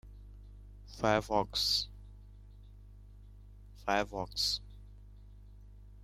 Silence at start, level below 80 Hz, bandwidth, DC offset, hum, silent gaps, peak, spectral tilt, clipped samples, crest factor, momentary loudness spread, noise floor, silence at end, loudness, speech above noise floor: 0.05 s; -52 dBFS; 16 kHz; under 0.1%; none; none; -14 dBFS; -3 dB/octave; under 0.1%; 24 dB; 26 LU; -53 dBFS; 0 s; -33 LUFS; 21 dB